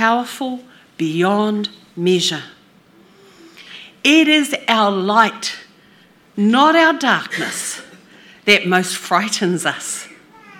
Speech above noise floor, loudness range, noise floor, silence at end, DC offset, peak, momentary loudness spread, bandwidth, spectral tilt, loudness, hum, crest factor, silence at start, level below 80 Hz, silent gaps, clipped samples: 34 dB; 6 LU; -50 dBFS; 0.45 s; under 0.1%; 0 dBFS; 17 LU; 17.5 kHz; -3.5 dB/octave; -16 LUFS; none; 18 dB; 0 s; -70 dBFS; none; under 0.1%